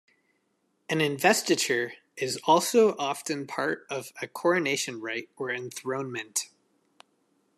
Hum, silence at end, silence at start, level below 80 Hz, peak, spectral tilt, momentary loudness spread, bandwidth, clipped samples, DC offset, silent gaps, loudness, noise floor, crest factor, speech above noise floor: none; 1.1 s; 0.9 s; -80 dBFS; -6 dBFS; -3 dB/octave; 12 LU; 14 kHz; under 0.1%; under 0.1%; none; -27 LUFS; -73 dBFS; 22 dB; 46 dB